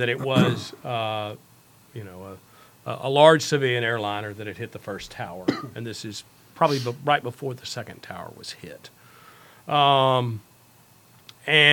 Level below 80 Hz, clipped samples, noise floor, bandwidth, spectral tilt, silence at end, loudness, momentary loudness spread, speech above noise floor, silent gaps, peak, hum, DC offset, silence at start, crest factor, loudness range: -64 dBFS; under 0.1%; -55 dBFS; 19 kHz; -4.5 dB/octave; 0 s; -23 LUFS; 22 LU; 31 dB; none; 0 dBFS; none; under 0.1%; 0 s; 24 dB; 5 LU